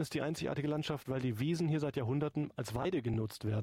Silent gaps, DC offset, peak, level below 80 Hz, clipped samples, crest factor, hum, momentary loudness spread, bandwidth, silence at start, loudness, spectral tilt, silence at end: none; under 0.1%; -24 dBFS; -62 dBFS; under 0.1%; 12 dB; none; 4 LU; 16 kHz; 0 s; -36 LUFS; -6.5 dB/octave; 0 s